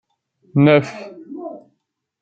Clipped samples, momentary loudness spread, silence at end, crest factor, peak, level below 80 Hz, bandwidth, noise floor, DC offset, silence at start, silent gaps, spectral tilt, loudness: under 0.1%; 21 LU; 0.65 s; 18 dB; -2 dBFS; -62 dBFS; 7.6 kHz; -72 dBFS; under 0.1%; 0.55 s; none; -8 dB/octave; -15 LUFS